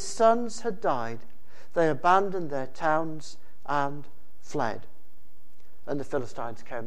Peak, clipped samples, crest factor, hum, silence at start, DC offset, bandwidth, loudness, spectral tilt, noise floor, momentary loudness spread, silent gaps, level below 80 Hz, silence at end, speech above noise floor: -6 dBFS; under 0.1%; 22 dB; none; 0 s; 4%; 13 kHz; -28 LUFS; -5 dB/octave; -61 dBFS; 19 LU; none; -62 dBFS; 0 s; 33 dB